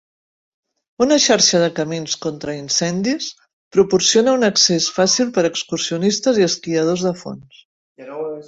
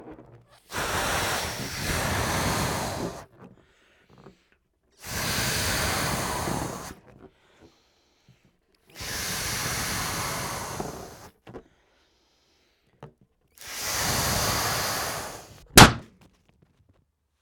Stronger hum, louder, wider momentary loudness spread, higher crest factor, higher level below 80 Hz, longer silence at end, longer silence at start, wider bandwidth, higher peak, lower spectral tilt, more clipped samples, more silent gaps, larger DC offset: neither; first, -16 LUFS vs -24 LUFS; second, 14 LU vs 17 LU; second, 18 dB vs 28 dB; second, -58 dBFS vs -42 dBFS; second, 0.05 s vs 1.35 s; first, 1 s vs 0 s; second, 8 kHz vs 19.5 kHz; about the same, -2 dBFS vs 0 dBFS; about the same, -3 dB/octave vs -3 dB/octave; neither; first, 3.53-3.71 s, 7.65-7.96 s vs none; neither